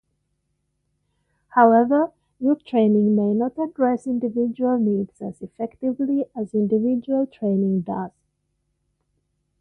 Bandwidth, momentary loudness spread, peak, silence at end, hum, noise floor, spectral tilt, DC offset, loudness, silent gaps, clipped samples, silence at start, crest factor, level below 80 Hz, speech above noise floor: 4.1 kHz; 12 LU; -2 dBFS; 1.5 s; none; -73 dBFS; -9.5 dB/octave; under 0.1%; -21 LUFS; none; under 0.1%; 1.55 s; 20 dB; -64 dBFS; 53 dB